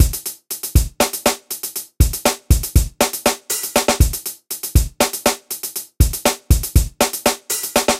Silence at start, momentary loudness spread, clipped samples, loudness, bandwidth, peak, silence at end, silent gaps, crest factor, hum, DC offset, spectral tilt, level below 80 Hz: 0 s; 9 LU; under 0.1%; -19 LUFS; 16.5 kHz; 0 dBFS; 0 s; none; 18 dB; none; under 0.1%; -3.5 dB/octave; -22 dBFS